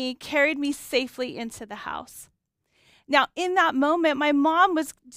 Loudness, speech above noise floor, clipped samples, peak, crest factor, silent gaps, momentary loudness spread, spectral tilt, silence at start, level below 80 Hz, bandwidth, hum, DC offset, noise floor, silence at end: -23 LUFS; 46 dB; under 0.1%; -4 dBFS; 20 dB; none; 14 LU; -2.5 dB/octave; 0 s; -64 dBFS; 16 kHz; none; under 0.1%; -71 dBFS; 0 s